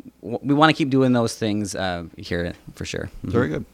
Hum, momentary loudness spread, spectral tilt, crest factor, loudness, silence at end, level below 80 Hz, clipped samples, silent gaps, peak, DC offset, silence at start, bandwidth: none; 14 LU; -5.5 dB/octave; 20 dB; -22 LUFS; 0.1 s; -48 dBFS; under 0.1%; none; -2 dBFS; under 0.1%; 0.05 s; 15 kHz